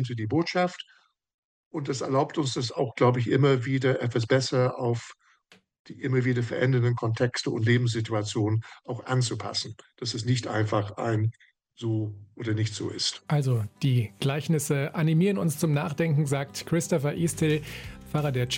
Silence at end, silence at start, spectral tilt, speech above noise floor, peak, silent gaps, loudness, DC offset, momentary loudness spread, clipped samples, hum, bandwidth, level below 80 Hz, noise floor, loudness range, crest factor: 0 s; 0 s; -6 dB/octave; 35 dB; -10 dBFS; 1.34-1.71 s, 5.79-5.85 s; -27 LUFS; under 0.1%; 9 LU; under 0.1%; none; 16.5 kHz; -60 dBFS; -61 dBFS; 4 LU; 18 dB